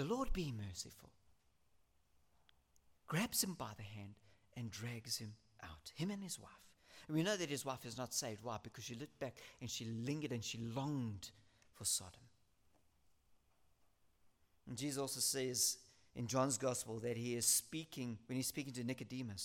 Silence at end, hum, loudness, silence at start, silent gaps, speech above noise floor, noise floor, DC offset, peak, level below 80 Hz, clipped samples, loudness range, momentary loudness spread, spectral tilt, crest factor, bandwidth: 0 s; none; -42 LUFS; 0 s; none; 35 dB; -78 dBFS; under 0.1%; -22 dBFS; -62 dBFS; under 0.1%; 9 LU; 16 LU; -3.5 dB/octave; 24 dB; 17 kHz